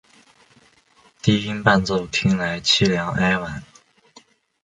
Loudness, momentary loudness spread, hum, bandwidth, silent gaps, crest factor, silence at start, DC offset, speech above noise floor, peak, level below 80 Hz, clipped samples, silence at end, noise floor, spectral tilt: -19 LUFS; 7 LU; none; 9.6 kHz; none; 22 dB; 1.25 s; under 0.1%; 37 dB; 0 dBFS; -48 dBFS; under 0.1%; 1 s; -56 dBFS; -4.5 dB/octave